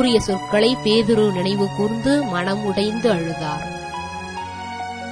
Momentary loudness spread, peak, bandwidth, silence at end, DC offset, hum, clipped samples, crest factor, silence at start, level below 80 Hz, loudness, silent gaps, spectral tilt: 12 LU; -4 dBFS; 11 kHz; 0 s; under 0.1%; none; under 0.1%; 16 dB; 0 s; -46 dBFS; -20 LUFS; none; -5.5 dB/octave